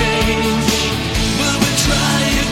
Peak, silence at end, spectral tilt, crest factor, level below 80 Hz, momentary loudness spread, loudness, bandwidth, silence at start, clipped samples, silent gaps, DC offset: -2 dBFS; 0 s; -3.5 dB/octave; 14 dB; -26 dBFS; 3 LU; -15 LUFS; 16.5 kHz; 0 s; under 0.1%; none; under 0.1%